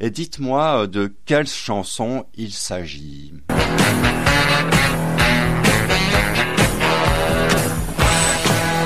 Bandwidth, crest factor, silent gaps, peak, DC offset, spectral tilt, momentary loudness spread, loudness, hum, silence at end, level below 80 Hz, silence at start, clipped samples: 15.5 kHz; 16 dB; none; -2 dBFS; 2%; -4 dB/octave; 11 LU; -17 LUFS; none; 0 s; -30 dBFS; 0 s; under 0.1%